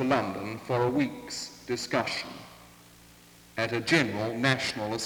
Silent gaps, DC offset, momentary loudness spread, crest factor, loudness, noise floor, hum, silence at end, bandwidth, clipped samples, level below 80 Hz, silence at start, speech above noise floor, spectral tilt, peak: none; under 0.1%; 12 LU; 22 dB; -29 LUFS; -54 dBFS; none; 0 s; over 20 kHz; under 0.1%; -62 dBFS; 0 s; 25 dB; -4.5 dB/octave; -8 dBFS